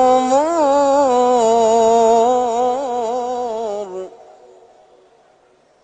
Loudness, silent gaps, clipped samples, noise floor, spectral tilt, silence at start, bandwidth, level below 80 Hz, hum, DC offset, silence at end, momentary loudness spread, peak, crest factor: -15 LUFS; none; under 0.1%; -54 dBFS; -3.5 dB/octave; 0 s; 9.4 kHz; -56 dBFS; none; under 0.1%; 1.75 s; 12 LU; -4 dBFS; 12 dB